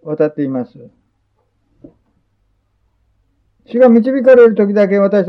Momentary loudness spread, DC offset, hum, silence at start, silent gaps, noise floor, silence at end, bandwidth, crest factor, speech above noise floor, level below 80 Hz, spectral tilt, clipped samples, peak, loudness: 15 LU; under 0.1%; none; 0.05 s; none; -62 dBFS; 0 s; 6 kHz; 14 dB; 51 dB; -60 dBFS; -9.5 dB/octave; under 0.1%; 0 dBFS; -11 LUFS